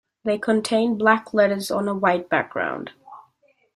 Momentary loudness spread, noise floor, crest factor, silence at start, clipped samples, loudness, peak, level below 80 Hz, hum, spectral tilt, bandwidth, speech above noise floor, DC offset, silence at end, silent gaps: 8 LU; -63 dBFS; 20 dB; 0.25 s; under 0.1%; -21 LUFS; -2 dBFS; -66 dBFS; none; -5 dB/octave; 14.5 kHz; 42 dB; under 0.1%; 0.55 s; none